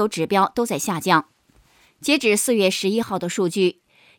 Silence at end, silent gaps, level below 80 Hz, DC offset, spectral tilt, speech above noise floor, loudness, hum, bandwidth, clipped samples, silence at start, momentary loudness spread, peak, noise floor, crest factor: 0.45 s; none; -62 dBFS; under 0.1%; -4 dB/octave; 37 dB; -20 LUFS; none; 19 kHz; under 0.1%; 0 s; 6 LU; -2 dBFS; -57 dBFS; 20 dB